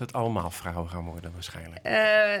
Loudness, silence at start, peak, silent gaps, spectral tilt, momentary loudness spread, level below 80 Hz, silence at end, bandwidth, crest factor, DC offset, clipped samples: -26 LUFS; 0 s; -10 dBFS; none; -5 dB/octave; 18 LU; -54 dBFS; 0 s; 18 kHz; 16 dB; under 0.1%; under 0.1%